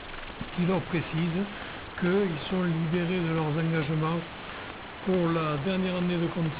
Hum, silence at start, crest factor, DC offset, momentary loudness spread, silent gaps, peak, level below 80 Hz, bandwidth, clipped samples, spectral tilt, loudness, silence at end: none; 0 s; 12 dB; under 0.1%; 12 LU; none; -16 dBFS; -52 dBFS; 4 kHz; under 0.1%; -6 dB/octave; -29 LUFS; 0 s